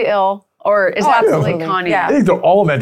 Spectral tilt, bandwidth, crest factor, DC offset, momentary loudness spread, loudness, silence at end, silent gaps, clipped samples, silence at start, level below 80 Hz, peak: -6.5 dB/octave; 14 kHz; 12 dB; under 0.1%; 5 LU; -14 LUFS; 0 s; none; under 0.1%; 0 s; -52 dBFS; -2 dBFS